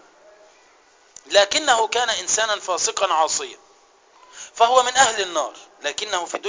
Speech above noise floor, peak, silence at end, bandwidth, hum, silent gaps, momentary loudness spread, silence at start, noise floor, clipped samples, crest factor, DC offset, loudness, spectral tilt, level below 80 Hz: 34 dB; -2 dBFS; 0 s; 7.8 kHz; none; none; 12 LU; 1.25 s; -54 dBFS; under 0.1%; 20 dB; under 0.1%; -19 LUFS; 1 dB/octave; -62 dBFS